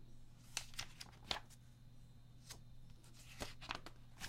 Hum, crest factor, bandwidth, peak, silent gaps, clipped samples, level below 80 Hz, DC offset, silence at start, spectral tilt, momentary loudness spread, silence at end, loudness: none; 34 dB; 16 kHz; -18 dBFS; none; under 0.1%; -60 dBFS; under 0.1%; 0 s; -2 dB/octave; 18 LU; 0 s; -50 LUFS